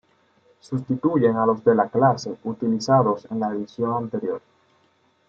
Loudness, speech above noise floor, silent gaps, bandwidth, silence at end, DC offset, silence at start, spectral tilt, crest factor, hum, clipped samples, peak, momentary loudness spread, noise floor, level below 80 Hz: -22 LUFS; 42 dB; none; 7.8 kHz; 0.9 s; under 0.1%; 0.7 s; -7.5 dB/octave; 18 dB; none; under 0.1%; -4 dBFS; 12 LU; -63 dBFS; -66 dBFS